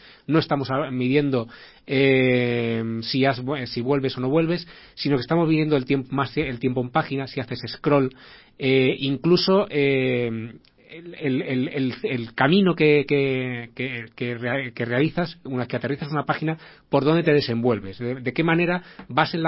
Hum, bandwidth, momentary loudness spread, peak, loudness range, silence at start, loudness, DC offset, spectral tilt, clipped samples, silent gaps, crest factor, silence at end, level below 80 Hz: none; 5.8 kHz; 11 LU; -2 dBFS; 2 LU; 0.3 s; -23 LUFS; under 0.1%; -10.5 dB/octave; under 0.1%; none; 20 dB; 0 s; -56 dBFS